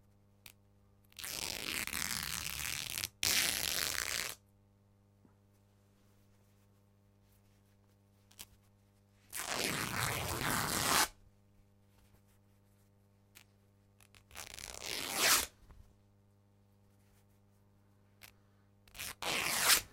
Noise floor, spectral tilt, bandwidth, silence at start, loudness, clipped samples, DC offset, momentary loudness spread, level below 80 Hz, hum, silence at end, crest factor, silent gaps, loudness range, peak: -68 dBFS; -1 dB/octave; 17 kHz; 1.2 s; -34 LUFS; under 0.1%; under 0.1%; 20 LU; -62 dBFS; 50 Hz at -70 dBFS; 0.05 s; 30 dB; none; 12 LU; -10 dBFS